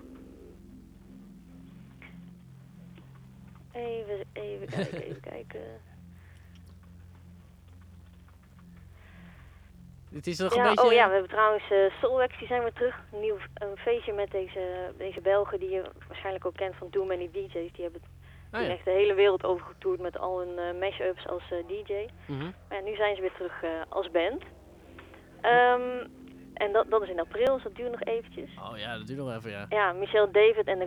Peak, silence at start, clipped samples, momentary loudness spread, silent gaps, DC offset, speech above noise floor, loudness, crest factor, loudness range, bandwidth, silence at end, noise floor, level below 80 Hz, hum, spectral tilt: -8 dBFS; 0 s; under 0.1%; 20 LU; none; under 0.1%; 25 dB; -29 LUFS; 22 dB; 16 LU; 11.5 kHz; 0 s; -53 dBFS; -56 dBFS; none; -5.5 dB/octave